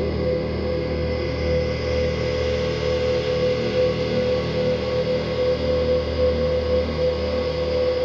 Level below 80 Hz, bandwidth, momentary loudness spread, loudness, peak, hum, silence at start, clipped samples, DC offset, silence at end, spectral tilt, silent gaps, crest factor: -32 dBFS; 7.2 kHz; 3 LU; -22 LUFS; -8 dBFS; none; 0 s; under 0.1%; under 0.1%; 0 s; -7 dB/octave; none; 12 dB